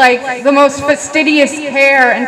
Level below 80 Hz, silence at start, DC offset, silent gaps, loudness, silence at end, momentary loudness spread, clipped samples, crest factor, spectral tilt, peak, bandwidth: -52 dBFS; 0 s; under 0.1%; none; -10 LUFS; 0 s; 6 LU; under 0.1%; 10 dB; -2.5 dB/octave; 0 dBFS; 15 kHz